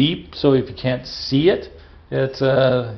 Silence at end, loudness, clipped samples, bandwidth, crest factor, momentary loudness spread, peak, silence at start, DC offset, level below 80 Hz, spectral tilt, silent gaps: 0 s; -19 LUFS; under 0.1%; 6.4 kHz; 16 dB; 8 LU; -4 dBFS; 0 s; under 0.1%; -46 dBFS; -5 dB/octave; none